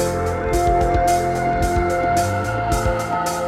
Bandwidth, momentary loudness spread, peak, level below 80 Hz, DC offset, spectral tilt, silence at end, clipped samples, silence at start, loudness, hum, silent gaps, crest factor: 16.5 kHz; 4 LU; -6 dBFS; -28 dBFS; under 0.1%; -5.5 dB/octave; 0 s; under 0.1%; 0 s; -19 LUFS; none; none; 14 dB